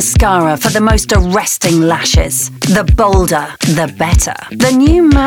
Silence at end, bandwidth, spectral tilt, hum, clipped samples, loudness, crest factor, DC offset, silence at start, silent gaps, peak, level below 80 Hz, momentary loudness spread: 0 s; 19 kHz; -4.5 dB/octave; none; under 0.1%; -11 LUFS; 10 dB; under 0.1%; 0 s; none; 0 dBFS; -18 dBFS; 5 LU